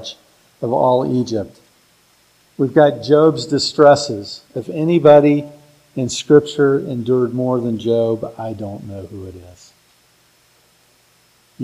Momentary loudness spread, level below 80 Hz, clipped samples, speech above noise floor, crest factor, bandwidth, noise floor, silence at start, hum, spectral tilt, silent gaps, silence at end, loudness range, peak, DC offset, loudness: 20 LU; -58 dBFS; under 0.1%; 40 dB; 18 dB; 11.5 kHz; -55 dBFS; 0 s; none; -6 dB/octave; none; 0 s; 11 LU; 0 dBFS; under 0.1%; -16 LUFS